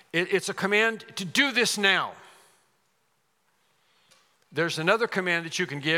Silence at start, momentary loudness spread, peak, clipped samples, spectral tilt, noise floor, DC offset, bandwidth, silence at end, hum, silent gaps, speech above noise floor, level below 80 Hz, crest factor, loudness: 0.15 s; 8 LU; -6 dBFS; under 0.1%; -3 dB/octave; -72 dBFS; under 0.1%; 17.5 kHz; 0 s; none; none; 46 dB; -84 dBFS; 22 dB; -25 LUFS